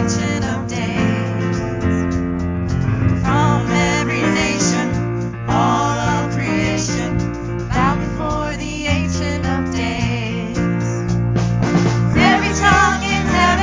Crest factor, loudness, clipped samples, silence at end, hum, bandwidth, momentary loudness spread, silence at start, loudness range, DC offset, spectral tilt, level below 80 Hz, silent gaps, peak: 16 dB; -18 LUFS; under 0.1%; 0 s; none; 7.6 kHz; 7 LU; 0 s; 4 LU; under 0.1%; -5.5 dB/octave; -30 dBFS; none; 0 dBFS